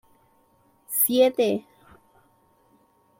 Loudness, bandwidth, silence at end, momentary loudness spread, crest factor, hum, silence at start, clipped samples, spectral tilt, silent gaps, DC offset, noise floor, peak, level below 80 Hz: -22 LUFS; 16.5 kHz; 1.6 s; 10 LU; 20 dB; none; 0.9 s; under 0.1%; -3 dB/octave; none; under 0.1%; -62 dBFS; -8 dBFS; -70 dBFS